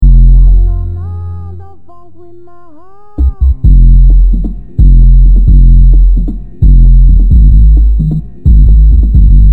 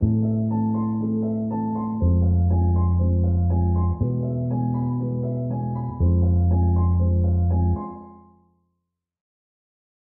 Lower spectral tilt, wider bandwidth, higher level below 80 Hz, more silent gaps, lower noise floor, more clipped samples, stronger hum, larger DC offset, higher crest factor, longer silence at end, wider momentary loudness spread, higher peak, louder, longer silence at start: second, -12 dB/octave vs -16.5 dB/octave; second, 1.3 kHz vs 1.8 kHz; first, -4 dBFS vs -32 dBFS; neither; second, -39 dBFS vs -79 dBFS; first, 4% vs under 0.1%; neither; first, 5% vs under 0.1%; second, 4 dB vs 12 dB; second, 0 s vs 1.85 s; first, 13 LU vs 6 LU; first, 0 dBFS vs -8 dBFS; first, -8 LUFS vs -22 LUFS; about the same, 0 s vs 0 s